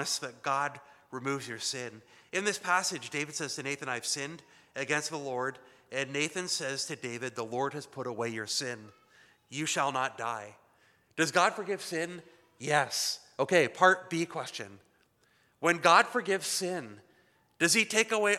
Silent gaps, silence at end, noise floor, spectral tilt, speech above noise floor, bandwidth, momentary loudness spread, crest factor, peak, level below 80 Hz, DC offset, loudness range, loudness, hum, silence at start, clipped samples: none; 0 s; -69 dBFS; -2.5 dB/octave; 37 dB; 16 kHz; 15 LU; 24 dB; -8 dBFS; -84 dBFS; under 0.1%; 7 LU; -30 LUFS; none; 0 s; under 0.1%